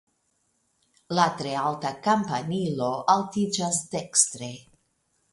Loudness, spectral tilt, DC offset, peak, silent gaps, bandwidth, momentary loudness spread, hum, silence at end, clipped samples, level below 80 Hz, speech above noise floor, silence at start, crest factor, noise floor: -25 LUFS; -3.5 dB/octave; under 0.1%; -4 dBFS; none; 11.5 kHz; 7 LU; none; 0.7 s; under 0.1%; -68 dBFS; 46 dB; 1.1 s; 22 dB; -72 dBFS